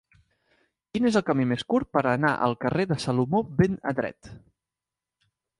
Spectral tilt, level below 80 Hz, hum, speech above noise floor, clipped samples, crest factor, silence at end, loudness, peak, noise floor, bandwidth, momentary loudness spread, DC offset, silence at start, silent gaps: -7 dB/octave; -54 dBFS; none; 64 dB; under 0.1%; 18 dB; 1.2 s; -25 LUFS; -8 dBFS; -89 dBFS; 11.5 kHz; 6 LU; under 0.1%; 0.95 s; none